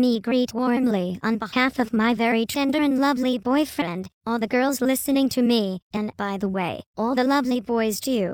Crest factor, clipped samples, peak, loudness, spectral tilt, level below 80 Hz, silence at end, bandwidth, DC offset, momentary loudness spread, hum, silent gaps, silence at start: 14 dB; under 0.1%; -8 dBFS; -23 LUFS; -4.5 dB/octave; -58 dBFS; 0 s; 17 kHz; under 0.1%; 7 LU; none; 4.13-4.21 s, 5.82-5.90 s, 6.86-6.94 s; 0 s